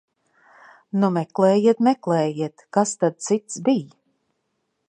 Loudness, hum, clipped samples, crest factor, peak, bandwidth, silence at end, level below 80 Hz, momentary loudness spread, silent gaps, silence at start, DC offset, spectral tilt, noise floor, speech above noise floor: -21 LUFS; none; under 0.1%; 18 dB; -4 dBFS; 10.5 kHz; 1 s; -74 dBFS; 8 LU; none; 0.95 s; under 0.1%; -6 dB/octave; -74 dBFS; 54 dB